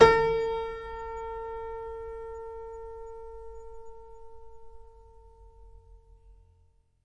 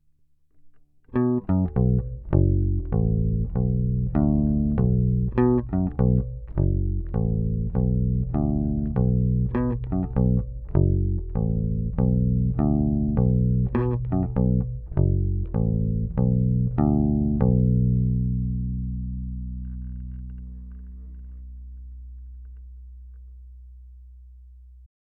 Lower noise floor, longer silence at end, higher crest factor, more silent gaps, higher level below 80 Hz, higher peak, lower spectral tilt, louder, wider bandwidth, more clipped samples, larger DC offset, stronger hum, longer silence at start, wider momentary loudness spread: first, -64 dBFS vs -60 dBFS; first, 0.7 s vs 0.15 s; first, 26 dB vs 18 dB; neither; second, -50 dBFS vs -30 dBFS; about the same, -4 dBFS vs -4 dBFS; second, -4.5 dB/octave vs -13 dB/octave; second, -32 LUFS vs -24 LUFS; first, 9.2 kHz vs 2.7 kHz; neither; neither; neither; second, 0 s vs 0.65 s; first, 23 LU vs 19 LU